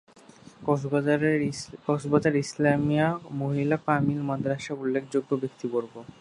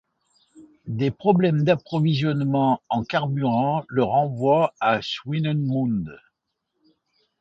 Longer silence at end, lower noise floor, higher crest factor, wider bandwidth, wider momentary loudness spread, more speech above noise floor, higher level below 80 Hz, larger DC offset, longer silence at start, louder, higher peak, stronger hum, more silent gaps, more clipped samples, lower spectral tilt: second, 0.15 s vs 1.25 s; second, -51 dBFS vs -78 dBFS; about the same, 20 dB vs 18 dB; first, 11 kHz vs 7.6 kHz; about the same, 7 LU vs 6 LU; second, 25 dB vs 57 dB; about the same, -62 dBFS vs -58 dBFS; neither; about the same, 0.6 s vs 0.55 s; second, -27 LUFS vs -22 LUFS; second, -8 dBFS vs -4 dBFS; neither; neither; neither; about the same, -7 dB/octave vs -8 dB/octave